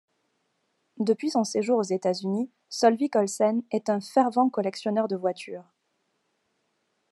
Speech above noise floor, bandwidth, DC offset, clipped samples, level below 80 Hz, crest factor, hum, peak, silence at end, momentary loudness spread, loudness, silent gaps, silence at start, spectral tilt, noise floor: 50 dB; 12.5 kHz; under 0.1%; under 0.1%; -86 dBFS; 20 dB; none; -8 dBFS; 1.5 s; 8 LU; -26 LUFS; none; 0.95 s; -5 dB/octave; -75 dBFS